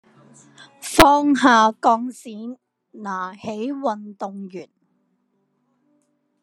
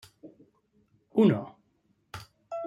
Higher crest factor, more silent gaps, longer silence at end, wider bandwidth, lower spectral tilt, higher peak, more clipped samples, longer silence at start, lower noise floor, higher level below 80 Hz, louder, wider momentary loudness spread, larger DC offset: about the same, 22 dB vs 20 dB; neither; first, 1.8 s vs 0 s; about the same, 13 kHz vs 12.5 kHz; second, -3.5 dB/octave vs -8.5 dB/octave; first, 0 dBFS vs -10 dBFS; neither; first, 0.6 s vs 0.25 s; about the same, -69 dBFS vs -71 dBFS; first, -46 dBFS vs -70 dBFS; first, -18 LUFS vs -27 LUFS; about the same, 21 LU vs 23 LU; neither